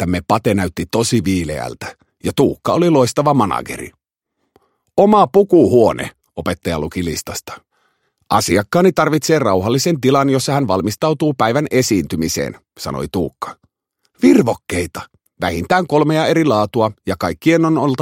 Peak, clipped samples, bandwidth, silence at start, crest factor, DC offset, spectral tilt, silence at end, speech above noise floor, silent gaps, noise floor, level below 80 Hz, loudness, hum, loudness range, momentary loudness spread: 0 dBFS; under 0.1%; 16.5 kHz; 0 s; 16 dB; under 0.1%; -5.5 dB/octave; 0 s; 57 dB; none; -72 dBFS; -44 dBFS; -16 LUFS; none; 4 LU; 14 LU